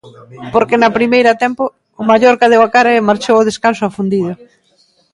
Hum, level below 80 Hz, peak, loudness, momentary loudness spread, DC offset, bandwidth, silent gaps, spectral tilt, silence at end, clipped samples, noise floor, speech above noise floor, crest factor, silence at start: none; -52 dBFS; 0 dBFS; -12 LUFS; 12 LU; under 0.1%; 11.5 kHz; none; -5 dB/octave; 0.8 s; under 0.1%; -54 dBFS; 43 dB; 12 dB; 0.05 s